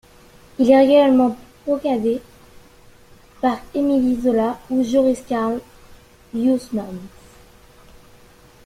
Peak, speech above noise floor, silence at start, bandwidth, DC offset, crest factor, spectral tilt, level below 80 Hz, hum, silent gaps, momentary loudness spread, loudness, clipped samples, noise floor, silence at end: -2 dBFS; 31 dB; 0.6 s; 14 kHz; under 0.1%; 18 dB; -6 dB/octave; -52 dBFS; none; none; 16 LU; -18 LUFS; under 0.1%; -48 dBFS; 1.6 s